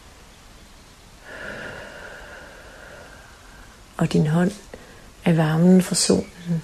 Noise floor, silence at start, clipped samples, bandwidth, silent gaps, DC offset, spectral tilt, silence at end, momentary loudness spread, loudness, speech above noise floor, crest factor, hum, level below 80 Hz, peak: -47 dBFS; 1.25 s; under 0.1%; 14 kHz; none; under 0.1%; -5.5 dB/octave; 0 s; 26 LU; -20 LUFS; 28 dB; 20 dB; none; -50 dBFS; -2 dBFS